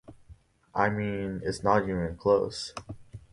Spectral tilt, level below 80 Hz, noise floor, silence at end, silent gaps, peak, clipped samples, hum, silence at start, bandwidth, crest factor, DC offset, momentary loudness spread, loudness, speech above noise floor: -6 dB/octave; -52 dBFS; -55 dBFS; 0.15 s; none; -8 dBFS; under 0.1%; none; 0.1 s; 11.5 kHz; 20 dB; under 0.1%; 15 LU; -29 LUFS; 27 dB